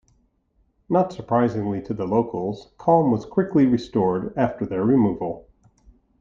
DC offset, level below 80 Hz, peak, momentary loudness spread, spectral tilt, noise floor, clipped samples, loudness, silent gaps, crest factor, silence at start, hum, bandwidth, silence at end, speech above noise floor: under 0.1%; -54 dBFS; -4 dBFS; 9 LU; -9 dB/octave; -65 dBFS; under 0.1%; -22 LUFS; none; 18 dB; 0.9 s; none; 7.4 kHz; 0.8 s; 44 dB